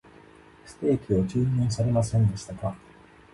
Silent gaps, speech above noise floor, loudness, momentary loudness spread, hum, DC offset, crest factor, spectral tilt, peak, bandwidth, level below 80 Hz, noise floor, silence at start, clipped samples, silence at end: none; 27 dB; -26 LUFS; 10 LU; none; under 0.1%; 14 dB; -7.5 dB/octave; -12 dBFS; 11.5 kHz; -48 dBFS; -52 dBFS; 0.65 s; under 0.1%; 0.55 s